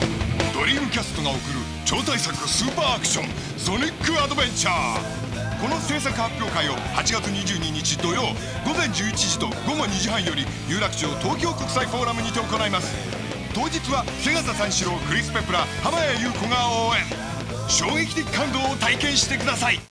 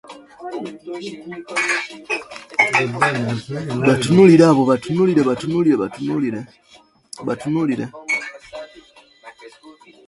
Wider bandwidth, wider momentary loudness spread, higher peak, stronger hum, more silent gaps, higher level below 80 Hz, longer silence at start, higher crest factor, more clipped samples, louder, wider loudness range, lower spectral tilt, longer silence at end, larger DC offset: about the same, 11 kHz vs 11.5 kHz; second, 6 LU vs 20 LU; about the same, -2 dBFS vs 0 dBFS; neither; neither; first, -40 dBFS vs -56 dBFS; about the same, 0 s vs 0.1 s; about the same, 22 dB vs 18 dB; neither; second, -23 LUFS vs -17 LUFS; second, 2 LU vs 11 LU; second, -3 dB/octave vs -6 dB/octave; second, 0.1 s vs 0.35 s; neither